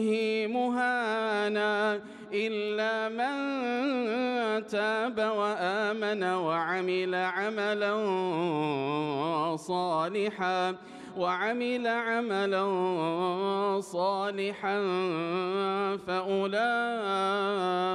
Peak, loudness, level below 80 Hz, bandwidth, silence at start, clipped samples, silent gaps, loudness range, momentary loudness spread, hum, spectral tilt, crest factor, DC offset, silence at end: -16 dBFS; -29 LUFS; -78 dBFS; 11.5 kHz; 0 s; under 0.1%; none; 1 LU; 3 LU; none; -5.5 dB/octave; 12 dB; under 0.1%; 0 s